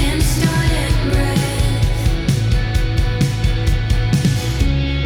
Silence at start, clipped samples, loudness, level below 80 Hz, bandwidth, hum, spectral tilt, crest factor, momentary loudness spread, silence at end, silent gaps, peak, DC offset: 0 s; under 0.1%; -17 LUFS; -20 dBFS; 17 kHz; none; -5.5 dB/octave; 10 dB; 2 LU; 0 s; none; -6 dBFS; under 0.1%